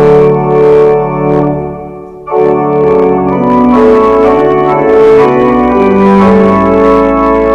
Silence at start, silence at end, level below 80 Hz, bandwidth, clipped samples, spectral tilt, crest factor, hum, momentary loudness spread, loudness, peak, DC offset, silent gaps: 0 s; 0 s; -30 dBFS; 6.6 kHz; 2%; -9 dB/octave; 6 dB; none; 6 LU; -7 LUFS; 0 dBFS; under 0.1%; none